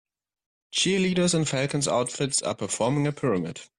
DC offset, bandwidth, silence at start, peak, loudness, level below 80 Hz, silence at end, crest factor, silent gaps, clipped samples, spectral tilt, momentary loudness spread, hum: under 0.1%; 12 kHz; 0.75 s; -10 dBFS; -25 LUFS; -60 dBFS; 0.15 s; 16 dB; none; under 0.1%; -4 dB/octave; 5 LU; none